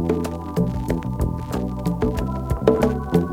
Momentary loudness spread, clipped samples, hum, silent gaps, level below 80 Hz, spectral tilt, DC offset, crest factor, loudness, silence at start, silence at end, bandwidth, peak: 7 LU; under 0.1%; none; none; -32 dBFS; -8 dB/octave; under 0.1%; 22 dB; -23 LUFS; 0 s; 0 s; 16.5 kHz; 0 dBFS